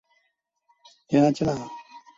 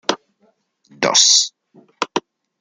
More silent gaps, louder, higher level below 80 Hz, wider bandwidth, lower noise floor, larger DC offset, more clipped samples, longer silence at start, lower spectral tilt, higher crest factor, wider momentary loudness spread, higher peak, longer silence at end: neither; second, -23 LUFS vs -15 LUFS; first, -58 dBFS vs -72 dBFS; second, 7.8 kHz vs 13 kHz; first, -75 dBFS vs -62 dBFS; neither; neither; first, 1.1 s vs 0.1 s; first, -7 dB/octave vs 0 dB/octave; about the same, 20 dB vs 20 dB; first, 20 LU vs 17 LU; second, -8 dBFS vs 0 dBFS; second, 0.2 s vs 0.4 s